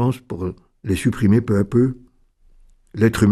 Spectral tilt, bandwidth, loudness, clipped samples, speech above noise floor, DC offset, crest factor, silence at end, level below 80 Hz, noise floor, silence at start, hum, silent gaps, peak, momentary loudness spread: -7.5 dB/octave; 13.5 kHz; -20 LUFS; under 0.1%; 36 dB; under 0.1%; 16 dB; 0 s; -44 dBFS; -54 dBFS; 0 s; none; none; -4 dBFS; 16 LU